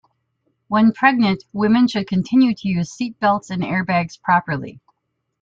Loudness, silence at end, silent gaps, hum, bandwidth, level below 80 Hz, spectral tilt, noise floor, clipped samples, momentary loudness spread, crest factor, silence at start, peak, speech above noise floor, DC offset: -18 LUFS; 0.7 s; none; none; 7.6 kHz; -56 dBFS; -6.5 dB/octave; -75 dBFS; under 0.1%; 8 LU; 18 dB; 0.7 s; -2 dBFS; 57 dB; under 0.1%